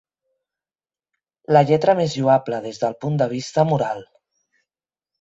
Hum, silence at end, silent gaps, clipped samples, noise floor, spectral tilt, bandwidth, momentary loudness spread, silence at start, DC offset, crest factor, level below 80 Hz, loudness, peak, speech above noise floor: none; 1.15 s; none; under 0.1%; under -90 dBFS; -6.5 dB/octave; 8 kHz; 10 LU; 1.5 s; under 0.1%; 20 dB; -62 dBFS; -19 LUFS; -2 dBFS; over 71 dB